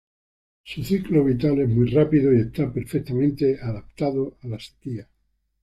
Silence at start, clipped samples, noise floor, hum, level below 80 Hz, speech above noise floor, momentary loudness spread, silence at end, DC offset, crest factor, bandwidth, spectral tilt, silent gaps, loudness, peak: 0.65 s; under 0.1%; under -90 dBFS; none; -48 dBFS; over 68 dB; 16 LU; 0.6 s; under 0.1%; 16 dB; 13.5 kHz; -8.5 dB/octave; none; -22 LUFS; -6 dBFS